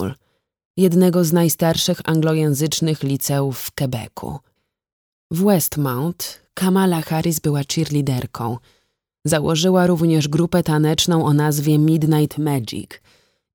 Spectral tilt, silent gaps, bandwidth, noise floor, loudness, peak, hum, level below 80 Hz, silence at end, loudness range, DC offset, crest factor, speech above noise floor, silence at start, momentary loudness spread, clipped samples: -5.5 dB/octave; 0.65-0.74 s, 4.92-5.30 s; over 20 kHz; -66 dBFS; -18 LUFS; -2 dBFS; none; -50 dBFS; 0.6 s; 5 LU; under 0.1%; 16 dB; 48 dB; 0 s; 13 LU; under 0.1%